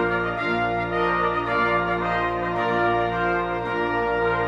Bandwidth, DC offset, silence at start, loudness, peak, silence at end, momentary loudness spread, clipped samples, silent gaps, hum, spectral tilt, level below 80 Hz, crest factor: 8.2 kHz; under 0.1%; 0 s; -23 LUFS; -10 dBFS; 0 s; 3 LU; under 0.1%; none; none; -7 dB/octave; -44 dBFS; 12 dB